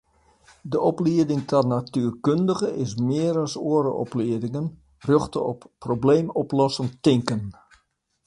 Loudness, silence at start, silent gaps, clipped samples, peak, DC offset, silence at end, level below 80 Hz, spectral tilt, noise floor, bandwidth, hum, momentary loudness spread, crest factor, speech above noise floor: -23 LUFS; 0.65 s; none; under 0.1%; -4 dBFS; under 0.1%; 0.75 s; -56 dBFS; -7 dB/octave; -68 dBFS; 11 kHz; none; 9 LU; 20 dB; 46 dB